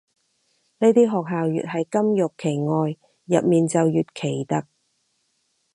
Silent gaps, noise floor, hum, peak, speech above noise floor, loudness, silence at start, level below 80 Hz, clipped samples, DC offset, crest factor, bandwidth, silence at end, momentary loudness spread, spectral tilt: none; -70 dBFS; none; -4 dBFS; 50 dB; -22 LUFS; 0.8 s; -68 dBFS; under 0.1%; under 0.1%; 18 dB; 11.5 kHz; 1.1 s; 8 LU; -7 dB/octave